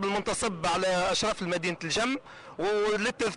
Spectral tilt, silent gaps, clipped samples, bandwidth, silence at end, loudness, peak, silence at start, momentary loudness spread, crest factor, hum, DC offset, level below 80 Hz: -3.5 dB/octave; none; under 0.1%; 11 kHz; 0 s; -28 LUFS; -20 dBFS; 0 s; 5 LU; 10 dB; none; under 0.1%; -54 dBFS